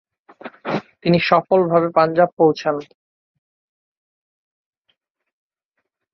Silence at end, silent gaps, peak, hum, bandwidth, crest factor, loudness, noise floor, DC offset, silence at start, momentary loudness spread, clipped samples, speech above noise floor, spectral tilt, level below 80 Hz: 3.3 s; 2.33-2.37 s; -2 dBFS; none; 6.4 kHz; 20 dB; -18 LUFS; -77 dBFS; under 0.1%; 0.45 s; 14 LU; under 0.1%; 61 dB; -7.5 dB/octave; -62 dBFS